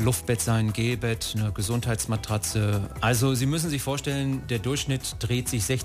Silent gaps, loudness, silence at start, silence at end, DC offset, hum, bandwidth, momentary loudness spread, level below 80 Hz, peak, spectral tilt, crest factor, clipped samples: none; -26 LUFS; 0 s; 0 s; under 0.1%; none; 15.5 kHz; 4 LU; -42 dBFS; -10 dBFS; -4.5 dB/octave; 16 dB; under 0.1%